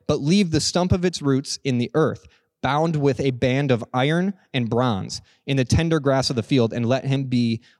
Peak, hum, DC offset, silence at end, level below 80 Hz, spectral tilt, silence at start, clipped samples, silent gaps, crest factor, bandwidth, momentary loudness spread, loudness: -6 dBFS; none; under 0.1%; 0.2 s; -46 dBFS; -6 dB/octave; 0.1 s; under 0.1%; none; 14 dB; 12 kHz; 5 LU; -22 LUFS